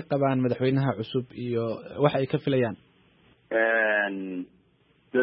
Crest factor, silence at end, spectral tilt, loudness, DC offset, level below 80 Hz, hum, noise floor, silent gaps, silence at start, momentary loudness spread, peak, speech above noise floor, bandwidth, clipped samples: 20 dB; 0 s; -11 dB/octave; -26 LUFS; under 0.1%; -66 dBFS; none; -64 dBFS; none; 0 s; 11 LU; -6 dBFS; 38 dB; 5.6 kHz; under 0.1%